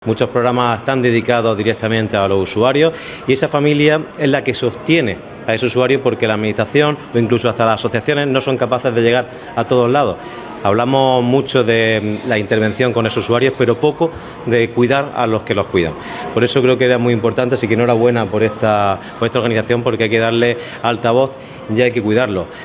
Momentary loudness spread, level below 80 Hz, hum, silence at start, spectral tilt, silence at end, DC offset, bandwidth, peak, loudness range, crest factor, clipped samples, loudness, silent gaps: 6 LU; -46 dBFS; none; 0 s; -10.5 dB/octave; 0 s; under 0.1%; 4 kHz; 0 dBFS; 1 LU; 14 dB; under 0.1%; -15 LUFS; none